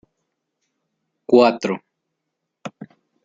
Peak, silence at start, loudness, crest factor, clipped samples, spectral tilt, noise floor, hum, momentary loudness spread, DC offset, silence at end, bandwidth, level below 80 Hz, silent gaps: -2 dBFS; 1.3 s; -18 LUFS; 22 dB; under 0.1%; -6 dB/octave; -79 dBFS; none; 23 LU; under 0.1%; 0.4 s; 7.6 kHz; -70 dBFS; none